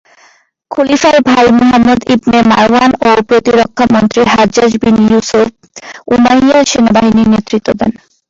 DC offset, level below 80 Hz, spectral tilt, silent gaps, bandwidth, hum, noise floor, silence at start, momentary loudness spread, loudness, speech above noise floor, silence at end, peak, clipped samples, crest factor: under 0.1%; -38 dBFS; -5 dB/octave; none; 7.8 kHz; none; -47 dBFS; 0.7 s; 7 LU; -8 LUFS; 39 dB; 0.4 s; 0 dBFS; under 0.1%; 8 dB